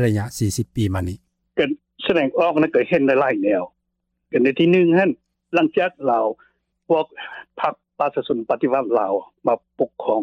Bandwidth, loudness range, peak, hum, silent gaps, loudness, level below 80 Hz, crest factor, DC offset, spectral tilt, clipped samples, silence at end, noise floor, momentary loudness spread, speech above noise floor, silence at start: 16 kHz; 4 LU; -6 dBFS; none; none; -20 LUFS; -56 dBFS; 14 dB; under 0.1%; -6.5 dB/octave; under 0.1%; 0 s; -75 dBFS; 10 LU; 56 dB; 0 s